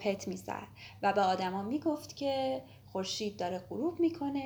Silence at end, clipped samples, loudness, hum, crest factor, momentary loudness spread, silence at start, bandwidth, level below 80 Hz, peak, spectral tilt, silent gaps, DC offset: 0 s; under 0.1%; -34 LUFS; none; 18 dB; 11 LU; 0 s; over 20 kHz; -68 dBFS; -16 dBFS; -5 dB/octave; none; under 0.1%